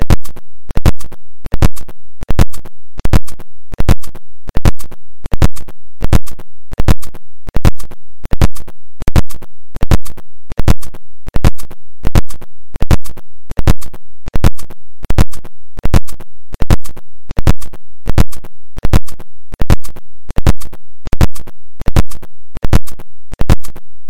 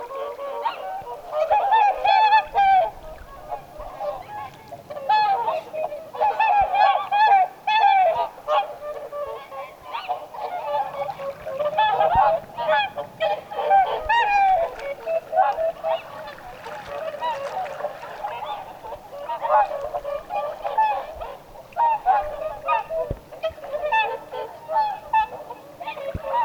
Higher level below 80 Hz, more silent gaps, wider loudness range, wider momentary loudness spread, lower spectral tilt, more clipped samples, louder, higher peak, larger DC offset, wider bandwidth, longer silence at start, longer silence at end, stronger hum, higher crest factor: first, -16 dBFS vs -50 dBFS; neither; second, 0 LU vs 7 LU; about the same, 19 LU vs 18 LU; first, -6.5 dB/octave vs -4 dB/octave; first, 0.2% vs under 0.1%; first, -18 LUFS vs -22 LUFS; first, 0 dBFS vs -6 dBFS; neither; second, 15.5 kHz vs 20 kHz; about the same, 0 s vs 0 s; about the same, 0 s vs 0 s; neither; second, 8 dB vs 18 dB